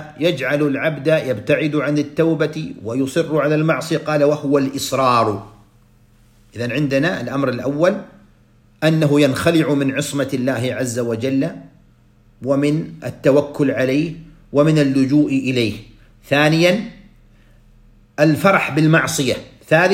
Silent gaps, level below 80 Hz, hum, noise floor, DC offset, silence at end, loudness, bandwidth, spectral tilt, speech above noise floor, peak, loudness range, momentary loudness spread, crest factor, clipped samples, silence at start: none; -52 dBFS; none; -52 dBFS; under 0.1%; 0 s; -18 LUFS; 16 kHz; -6 dB/octave; 35 dB; 0 dBFS; 4 LU; 9 LU; 18 dB; under 0.1%; 0 s